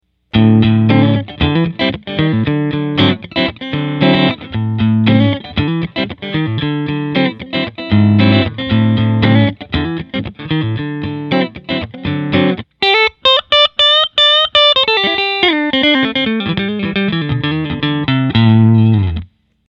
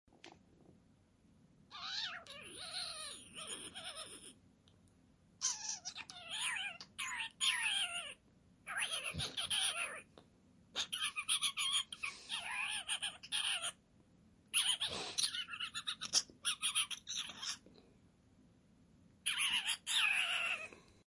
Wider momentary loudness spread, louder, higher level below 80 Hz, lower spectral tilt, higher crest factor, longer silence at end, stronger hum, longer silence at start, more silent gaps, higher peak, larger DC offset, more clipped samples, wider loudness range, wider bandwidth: second, 11 LU vs 14 LU; first, -13 LUFS vs -38 LUFS; first, -38 dBFS vs -76 dBFS; first, -7.5 dB/octave vs 1 dB/octave; second, 12 dB vs 24 dB; first, 0.45 s vs 0.3 s; neither; about the same, 0.35 s vs 0.25 s; neither; first, 0 dBFS vs -18 dBFS; neither; neither; about the same, 6 LU vs 8 LU; second, 7.4 kHz vs 11.5 kHz